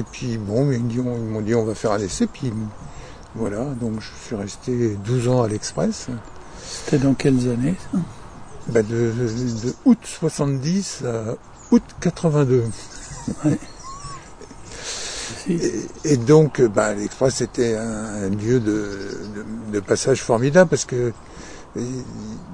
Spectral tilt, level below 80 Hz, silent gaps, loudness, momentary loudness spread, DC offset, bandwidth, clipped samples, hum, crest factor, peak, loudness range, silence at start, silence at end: -6 dB/octave; -44 dBFS; none; -21 LUFS; 17 LU; under 0.1%; 10 kHz; under 0.1%; none; 20 dB; -2 dBFS; 5 LU; 0 s; 0 s